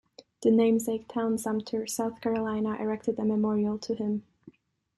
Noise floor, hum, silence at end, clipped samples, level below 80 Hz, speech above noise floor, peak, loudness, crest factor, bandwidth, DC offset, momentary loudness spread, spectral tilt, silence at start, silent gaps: -56 dBFS; none; 0.5 s; under 0.1%; -66 dBFS; 28 dB; -12 dBFS; -29 LUFS; 18 dB; 13 kHz; under 0.1%; 8 LU; -6 dB/octave; 0.4 s; none